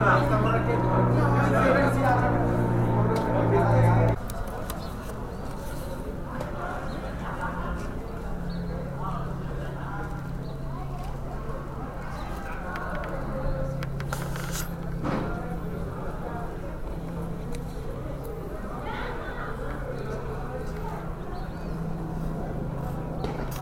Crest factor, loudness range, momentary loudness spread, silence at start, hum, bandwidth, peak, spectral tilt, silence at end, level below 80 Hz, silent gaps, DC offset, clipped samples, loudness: 20 dB; 12 LU; 13 LU; 0 s; none; 16.5 kHz; -8 dBFS; -7 dB/octave; 0 s; -36 dBFS; none; under 0.1%; under 0.1%; -29 LUFS